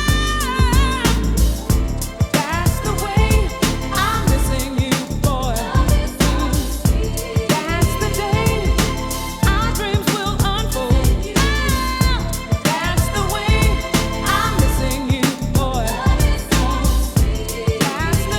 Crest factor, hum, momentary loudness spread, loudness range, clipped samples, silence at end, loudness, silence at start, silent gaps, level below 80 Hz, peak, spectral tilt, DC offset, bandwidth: 16 dB; none; 4 LU; 1 LU; under 0.1%; 0 s; -18 LUFS; 0 s; none; -22 dBFS; -2 dBFS; -4.5 dB/octave; under 0.1%; 18 kHz